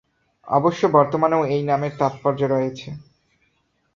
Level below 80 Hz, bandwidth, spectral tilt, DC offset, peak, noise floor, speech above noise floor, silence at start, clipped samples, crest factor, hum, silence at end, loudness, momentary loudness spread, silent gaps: -60 dBFS; 7.4 kHz; -7.5 dB/octave; under 0.1%; -2 dBFS; -67 dBFS; 48 dB; 0.45 s; under 0.1%; 20 dB; none; 0.95 s; -20 LUFS; 13 LU; none